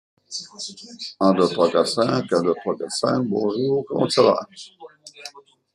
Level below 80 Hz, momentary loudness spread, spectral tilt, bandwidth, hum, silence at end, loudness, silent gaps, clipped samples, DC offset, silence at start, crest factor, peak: -68 dBFS; 21 LU; -5 dB/octave; 12.5 kHz; none; 0.35 s; -21 LUFS; none; under 0.1%; under 0.1%; 0.3 s; 20 dB; -2 dBFS